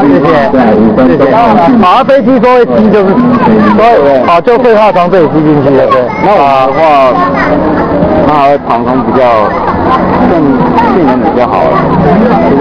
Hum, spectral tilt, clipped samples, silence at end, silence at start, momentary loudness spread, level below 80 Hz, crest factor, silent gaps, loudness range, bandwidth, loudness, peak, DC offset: none; -8.5 dB/octave; 6%; 0 s; 0 s; 4 LU; -30 dBFS; 6 dB; none; 2 LU; 5.4 kHz; -6 LUFS; 0 dBFS; under 0.1%